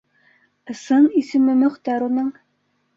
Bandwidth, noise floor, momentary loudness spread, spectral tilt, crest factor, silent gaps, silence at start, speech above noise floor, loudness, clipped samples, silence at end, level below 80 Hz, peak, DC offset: 7.6 kHz; -68 dBFS; 14 LU; -5.5 dB/octave; 14 dB; none; 0.7 s; 50 dB; -18 LUFS; under 0.1%; 0.65 s; -68 dBFS; -6 dBFS; under 0.1%